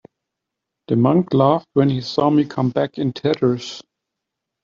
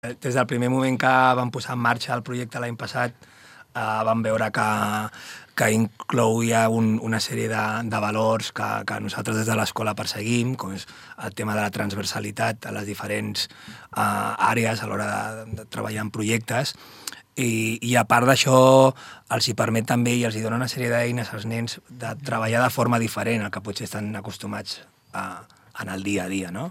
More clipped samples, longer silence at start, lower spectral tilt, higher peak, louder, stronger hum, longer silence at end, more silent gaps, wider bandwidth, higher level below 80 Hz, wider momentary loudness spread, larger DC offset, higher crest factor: neither; first, 0.9 s vs 0.05 s; first, -8 dB/octave vs -5 dB/octave; about the same, -4 dBFS vs -2 dBFS; first, -18 LUFS vs -23 LUFS; neither; first, 0.8 s vs 0 s; neither; second, 7.4 kHz vs 16 kHz; about the same, -60 dBFS vs -64 dBFS; second, 7 LU vs 14 LU; neither; second, 16 dB vs 22 dB